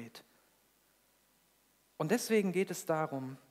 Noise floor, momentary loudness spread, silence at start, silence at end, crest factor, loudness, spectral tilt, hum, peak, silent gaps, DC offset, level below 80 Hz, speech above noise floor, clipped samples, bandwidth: -71 dBFS; 16 LU; 0 s; 0.15 s; 20 dB; -34 LUFS; -5 dB/octave; none; -18 dBFS; none; under 0.1%; -86 dBFS; 38 dB; under 0.1%; 16 kHz